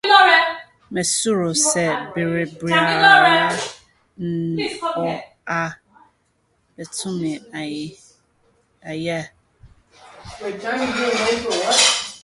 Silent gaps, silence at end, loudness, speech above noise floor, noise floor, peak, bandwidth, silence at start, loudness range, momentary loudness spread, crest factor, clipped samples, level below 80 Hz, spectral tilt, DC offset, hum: none; 0.05 s; -18 LUFS; 45 dB; -65 dBFS; 0 dBFS; 11.5 kHz; 0.05 s; 14 LU; 19 LU; 20 dB; under 0.1%; -56 dBFS; -2.5 dB/octave; under 0.1%; none